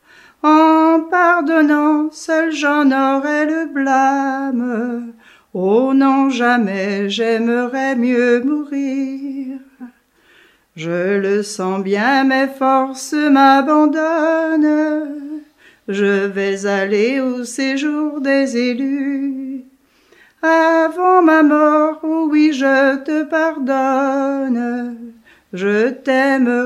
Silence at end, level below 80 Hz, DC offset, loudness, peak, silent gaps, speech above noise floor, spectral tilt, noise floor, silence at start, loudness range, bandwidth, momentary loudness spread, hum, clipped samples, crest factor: 0 s; -68 dBFS; under 0.1%; -15 LUFS; 0 dBFS; none; 37 dB; -5 dB/octave; -52 dBFS; 0.45 s; 6 LU; 12.5 kHz; 12 LU; none; under 0.1%; 16 dB